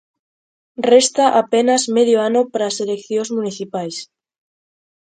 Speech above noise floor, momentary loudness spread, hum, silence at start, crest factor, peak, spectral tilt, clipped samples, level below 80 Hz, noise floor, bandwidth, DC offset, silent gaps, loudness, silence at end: over 74 dB; 13 LU; none; 0.8 s; 18 dB; 0 dBFS; -3 dB/octave; under 0.1%; -68 dBFS; under -90 dBFS; 9.4 kHz; under 0.1%; none; -16 LUFS; 1.1 s